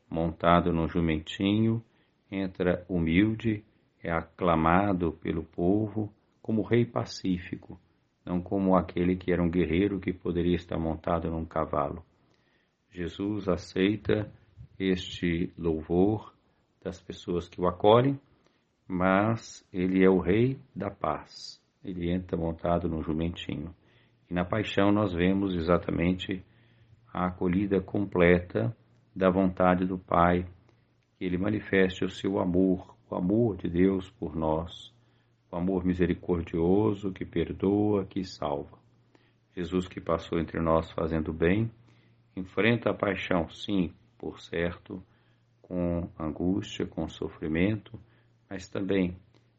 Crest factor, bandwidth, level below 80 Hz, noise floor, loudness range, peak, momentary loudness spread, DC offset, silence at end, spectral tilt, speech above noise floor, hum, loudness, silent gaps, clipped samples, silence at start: 24 dB; 7.6 kHz; -54 dBFS; -70 dBFS; 5 LU; -4 dBFS; 14 LU; under 0.1%; 0.4 s; -6 dB/octave; 42 dB; none; -29 LUFS; none; under 0.1%; 0.1 s